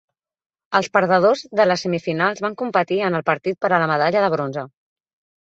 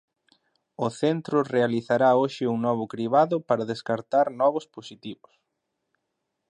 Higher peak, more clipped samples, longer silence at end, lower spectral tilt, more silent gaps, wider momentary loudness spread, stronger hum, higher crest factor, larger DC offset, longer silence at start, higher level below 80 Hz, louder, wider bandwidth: first, -2 dBFS vs -8 dBFS; neither; second, 0.75 s vs 1.35 s; about the same, -5.5 dB/octave vs -6.5 dB/octave; neither; second, 7 LU vs 16 LU; neither; about the same, 18 dB vs 18 dB; neither; about the same, 0.7 s vs 0.8 s; first, -66 dBFS vs -74 dBFS; first, -19 LUFS vs -24 LUFS; second, 8 kHz vs 9.8 kHz